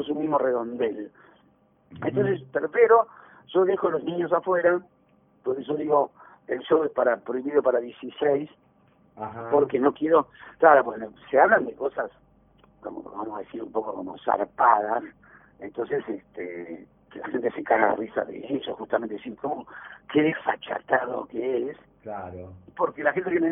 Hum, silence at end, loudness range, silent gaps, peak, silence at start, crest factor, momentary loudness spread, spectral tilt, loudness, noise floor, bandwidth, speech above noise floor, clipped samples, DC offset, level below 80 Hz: none; 0 s; 6 LU; none; -2 dBFS; 0 s; 22 dB; 18 LU; -10 dB/octave; -25 LUFS; -62 dBFS; 3.7 kHz; 37 dB; under 0.1%; under 0.1%; -66 dBFS